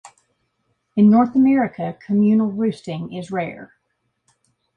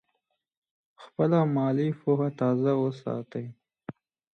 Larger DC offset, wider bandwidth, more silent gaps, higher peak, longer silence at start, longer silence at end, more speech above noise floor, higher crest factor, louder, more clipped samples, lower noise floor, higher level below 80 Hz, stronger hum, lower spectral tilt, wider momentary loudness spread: neither; first, 9 kHz vs 6.4 kHz; neither; first, -6 dBFS vs -12 dBFS; about the same, 0.95 s vs 1 s; first, 1.1 s vs 0.45 s; about the same, 54 dB vs 53 dB; about the same, 14 dB vs 16 dB; first, -19 LUFS vs -27 LUFS; neither; second, -72 dBFS vs -79 dBFS; first, -62 dBFS vs -74 dBFS; neither; second, -8.5 dB/octave vs -10 dB/octave; second, 15 LU vs 21 LU